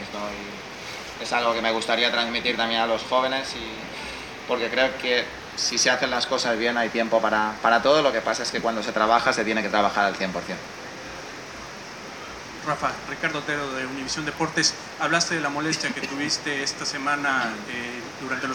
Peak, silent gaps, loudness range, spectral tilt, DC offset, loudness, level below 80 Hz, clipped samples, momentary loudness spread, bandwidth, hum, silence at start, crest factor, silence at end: -4 dBFS; none; 7 LU; -2.5 dB/octave; under 0.1%; -24 LUFS; -56 dBFS; under 0.1%; 15 LU; 17 kHz; none; 0 s; 22 dB; 0 s